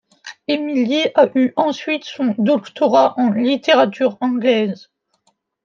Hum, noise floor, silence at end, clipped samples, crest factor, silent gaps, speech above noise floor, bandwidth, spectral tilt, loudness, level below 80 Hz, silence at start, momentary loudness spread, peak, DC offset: none; -64 dBFS; 0.9 s; under 0.1%; 16 dB; none; 48 dB; 7.2 kHz; -5.5 dB/octave; -17 LUFS; -72 dBFS; 0.25 s; 9 LU; -2 dBFS; under 0.1%